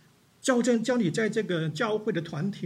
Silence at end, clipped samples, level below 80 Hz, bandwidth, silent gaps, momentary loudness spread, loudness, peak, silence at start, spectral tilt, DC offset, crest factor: 0 s; under 0.1%; -74 dBFS; 13 kHz; none; 7 LU; -27 LUFS; -10 dBFS; 0.45 s; -5.5 dB/octave; under 0.1%; 18 dB